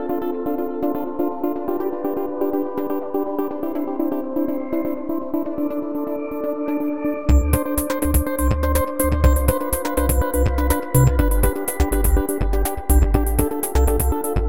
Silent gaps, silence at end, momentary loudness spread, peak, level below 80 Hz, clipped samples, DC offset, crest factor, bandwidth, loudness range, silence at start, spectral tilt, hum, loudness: none; 0 s; 7 LU; -2 dBFS; -24 dBFS; under 0.1%; 2%; 18 dB; 17 kHz; 5 LU; 0 s; -6.5 dB/octave; none; -21 LUFS